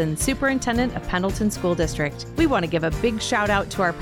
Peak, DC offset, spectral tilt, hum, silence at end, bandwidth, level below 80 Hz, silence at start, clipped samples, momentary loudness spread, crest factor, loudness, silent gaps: -8 dBFS; under 0.1%; -5 dB/octave; none; 0 s; 18.5 kHz; -36 dBFS; 0 s; under 0.1%; 4 LU; 14 dB; -23 LUFS; none